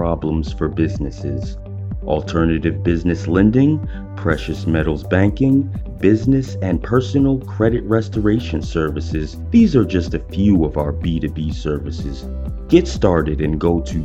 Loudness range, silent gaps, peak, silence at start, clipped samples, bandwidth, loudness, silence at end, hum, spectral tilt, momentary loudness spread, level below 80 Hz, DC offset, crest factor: 2 LU; none; 0 dBFS; 0 s; under 0.1%; 8.2 kHz; -18 LUFS; 0 s; none; -8 dB/octave; 11 LU; -28 dBFS; under 0.1%; 18 dB